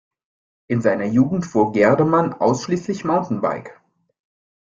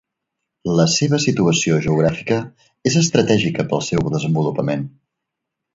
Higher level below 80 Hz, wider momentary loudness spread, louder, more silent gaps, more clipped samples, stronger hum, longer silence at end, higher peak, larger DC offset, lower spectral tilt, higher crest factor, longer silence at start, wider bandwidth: second, -56 dBFS vs -48 dBFS; about the same, 8 LU vs 8 LU; about the same, -19 LUFS vs -18 LUFS; neither; neither; neither; about the same, 0.9 s vs 0.85 s; about the same, -2 dBFS vs 0 dBFS; neither; first, -7 dB/octave vs -5 dB/octave; about the same, 18 dB vs 18 dB; about the same, 0.7 s vs 0.65 s; about the same, 7.6 kHz vs 7.8 kHz